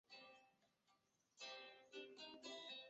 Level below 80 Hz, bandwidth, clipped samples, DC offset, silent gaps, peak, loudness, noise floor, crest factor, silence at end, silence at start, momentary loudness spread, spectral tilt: under -90 dBFS; 8 kHz; under 0.1%; under 0.1%; none; -42 dBFS; -57 LUFS; -83 dBFS; 18 dB; 0 s; 0.1 s; 8 LU; 1 dB/octave